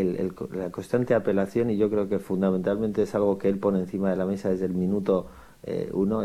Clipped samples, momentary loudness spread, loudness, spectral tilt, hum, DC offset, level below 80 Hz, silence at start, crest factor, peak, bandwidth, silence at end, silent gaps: under 0.1%; 8 LU; -26 LUFS; -8.5 dB/octave; none; under 0.1%; -56 dBFS; 0 s; 16 dB; -10 dBFS; 14 kHz; 0 s; none